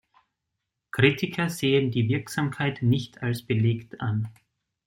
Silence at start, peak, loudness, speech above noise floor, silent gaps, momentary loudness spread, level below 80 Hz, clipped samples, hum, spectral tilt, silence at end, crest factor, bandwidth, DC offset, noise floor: 0.95 s; -4 dBFS; -26 LUFS; 58 dB; none; 9 LU; -60 dBFS; under 0.1%; none; -6.5 dB/octave; 0.55 s; 22 dB; 16.5 kHz; under 0.1%; -83 dBFS